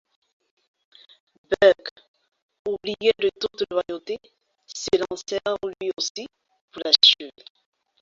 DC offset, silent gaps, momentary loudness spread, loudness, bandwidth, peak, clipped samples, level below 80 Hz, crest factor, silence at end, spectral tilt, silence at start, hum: under 0.1%; 1.91-1.96 s, 2.08-2.14 s, 2.42-2.49 s, 2.59-2.65 s, 6.10-6.15 s, 6.61-6.68 s; 20 LU; -22 LUFS; 7.8 kHz; 0 dBFS; under 0.1%; -62 dBFS; 24 dB; 0.7 s; -2 dB/octave; 1.5 s; none